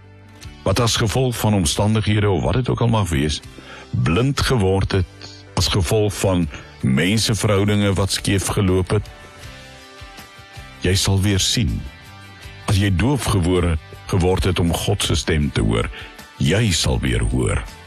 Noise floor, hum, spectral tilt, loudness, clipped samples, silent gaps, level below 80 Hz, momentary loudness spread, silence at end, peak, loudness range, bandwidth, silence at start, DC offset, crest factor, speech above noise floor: -40 dBFS; none; -5 dB/octave; -19 LUFS; under 0.1%; none; -30 dBFS; 20 LU; 0 s; -6 dBFS; 3 LU; 14 kHz; 0.35 s; under 0.1%; 12 dB; 22 dB